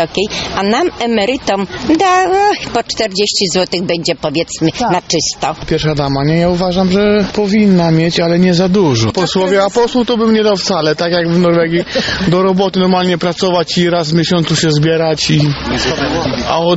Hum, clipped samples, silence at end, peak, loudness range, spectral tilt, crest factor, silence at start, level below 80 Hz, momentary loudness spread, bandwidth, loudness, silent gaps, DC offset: none; under 0.1%; 0 s; 0 dBFS; 3 LU; -5 dB/octave; 12 dB; 0 s; -36 dBFS; 5 LU; 8.2 kHz; -12 LUFS; none; under 0.1%